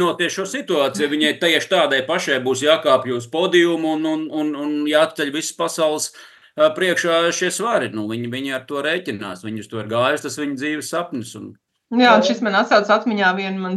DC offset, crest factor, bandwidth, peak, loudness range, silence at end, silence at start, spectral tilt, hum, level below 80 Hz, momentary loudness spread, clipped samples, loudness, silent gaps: under 0.1%; 18 dB; 12.5 kHz; 0 dBFS; 6 LU; 0 s; 0 s; -3.5 dB/octave; none; -74 dBFS; 10 LU; under 0.1%; -19 LUFS; none